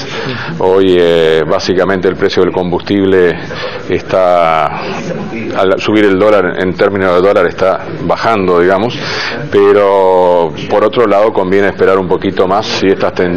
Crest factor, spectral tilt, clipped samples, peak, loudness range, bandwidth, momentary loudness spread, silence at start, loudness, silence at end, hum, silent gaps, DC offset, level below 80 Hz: 10 dB; -6 dB/octave; 0.3%; 0 dBFS; 2 LU; 9.2 kHz; 9 LU; 0 s; -10 LUFS; 0 s; none; none; 3%; -42 dBFS